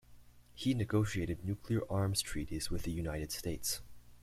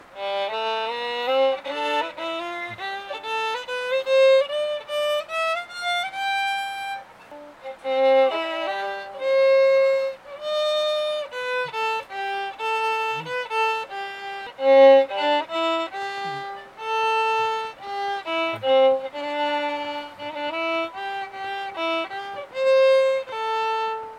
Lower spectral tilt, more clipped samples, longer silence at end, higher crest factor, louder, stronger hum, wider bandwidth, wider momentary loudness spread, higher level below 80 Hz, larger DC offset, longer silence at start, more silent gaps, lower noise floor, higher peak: first, -5 dB/octave vs -3 dB/octave; neither; about the same, 0 s vs 0 s; about the same, 18 dB vs 18 dB; second, -37 LUFS vs -23 LUFS; first, 60 Hz at -55 dBFS vs none; first, 16 kHz vs 11.5 kHz; second, 6 LU vs 14 LU; first, -50 dBFS vs -70 dBFS; neither; about the same, 0.1 s vs 0 s; neither; first, -58 dBFS vs -43 dBFS; second, -18 dBFS vs -4 dBFS